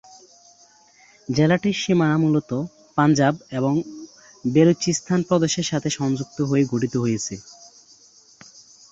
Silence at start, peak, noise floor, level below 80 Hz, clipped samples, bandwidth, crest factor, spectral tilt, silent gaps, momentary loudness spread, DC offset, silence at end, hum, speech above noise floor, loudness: 1.3 s; -4 dBFS; -54 dBFS; -58 dBFS; under 0.1%; 8 kHz; 18 dB; -5.5 dB/octave; none; 11 LU; under 0.1%; 1.4 s; none; 34 dB; -21 LUFS